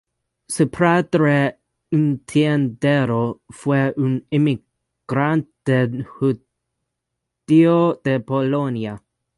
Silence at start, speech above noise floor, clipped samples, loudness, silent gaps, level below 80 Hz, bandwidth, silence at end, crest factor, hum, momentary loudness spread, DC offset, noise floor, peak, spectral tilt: 0.5 s; 61 dB; under 0.1%; -19 LUFS; none; -58 dBFS; 11.5 kHz; 0.4 s; 16 dB; none; 10 LU; under 0.1%; -79 dBFS; -2 dBFS; -7 dB/octave